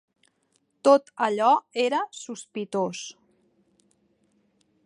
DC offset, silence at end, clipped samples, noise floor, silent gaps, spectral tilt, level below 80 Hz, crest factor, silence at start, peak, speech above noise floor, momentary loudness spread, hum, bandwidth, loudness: under 0.1%; 1.75 s; under 0.1%; -71 dBFS; none; -4 dB/octave; -84 dBFS; 22 dB; 0.85 s; -4 dBFS; 47 dB; 16 LU; none; 11 kHz; -24 LUFS